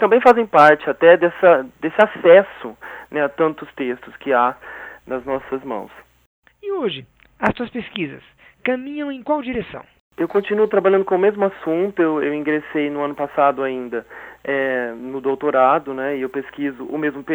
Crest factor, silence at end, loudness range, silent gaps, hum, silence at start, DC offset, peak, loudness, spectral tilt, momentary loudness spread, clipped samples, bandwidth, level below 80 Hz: 18 dB; 0 s; 10 LU; 6.26-6.42 s, 10.00-10.10 s; none; 0 s; under 0.1%; 0 dBFS; -18 LUFS; -7 dB/octave; 16 LU; under 0.1%; 8 kHz; -56 dBFS